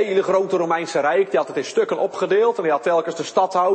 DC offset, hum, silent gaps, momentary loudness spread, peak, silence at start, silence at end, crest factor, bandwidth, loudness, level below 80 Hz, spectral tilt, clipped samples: under 0.1%; none; none; 4 LU; -6 dBFS; 0 s; 0 s; 14 dB; 8.8 kHz; -20 LUFS; -76 dBFS; -4.5 dB/octave; under 0.1%